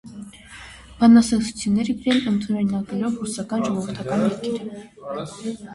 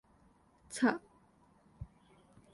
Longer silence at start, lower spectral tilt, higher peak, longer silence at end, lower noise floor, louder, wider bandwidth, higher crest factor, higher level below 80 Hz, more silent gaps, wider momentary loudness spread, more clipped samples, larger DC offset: second, 0.05 s vs 0.7 s; about the same, -5.5 dB/octave vs -4.5 dB/octave; first, -4 dBFS vs -16 dBFS; second, 0 s vs 0.65 s; second, -42 dBFS vs -67 dBFS; first, -21 LUFS vs -35 LUFS; about the same, 11.5 kHz vs 11.5 kHz; second, 16 dB vs 24 dB; first, -52 dBFS vs -64 dBFS; neither; first, 24 LU vs 21 LU; neither; neither